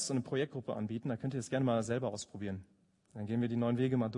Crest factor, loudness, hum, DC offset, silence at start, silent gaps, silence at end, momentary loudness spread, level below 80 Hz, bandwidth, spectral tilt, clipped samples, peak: 14 dB; -36 LUFS; none; under 0.1%; 0 s; none; 0 s; 10 LU; -72 dBFS; 11 kHz; -6 dB/octave; under 0.1%; -20 dBFS